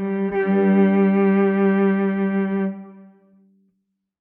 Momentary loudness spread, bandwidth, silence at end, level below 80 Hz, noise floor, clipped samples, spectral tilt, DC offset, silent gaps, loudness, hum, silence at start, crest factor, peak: 7 LU; 3.5 kHz; 1.2 s; -62 dBFS; -74 dBFS; under 0.1%; -11.5 dB/octave; under 0.1%; none; -19 LUFS; none; 0 s; 12 dB; -8 dBFS